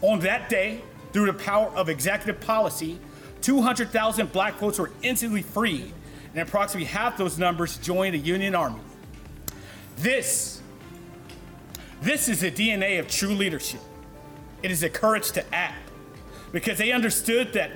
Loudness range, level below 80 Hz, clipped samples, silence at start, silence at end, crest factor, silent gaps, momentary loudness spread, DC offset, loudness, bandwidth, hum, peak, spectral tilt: 3 LU; -50 dBFS; under 0.1%; 0 s; 0 s; 14 dB; none; 22 LU; under 0.1%; -25 LUFS; 19.5 kHz; none; -12 dBFS; -3.5 dB/octave